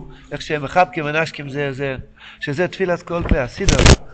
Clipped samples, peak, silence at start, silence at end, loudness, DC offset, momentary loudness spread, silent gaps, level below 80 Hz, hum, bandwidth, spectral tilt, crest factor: under 0.1%; 0 dBFS; 0 s; 0 s; -19 LUFS; under 0.1%; 14 LU; none; -24 dBFS; none; 9.2 kHz; -4.5 dB/octave; 18 dB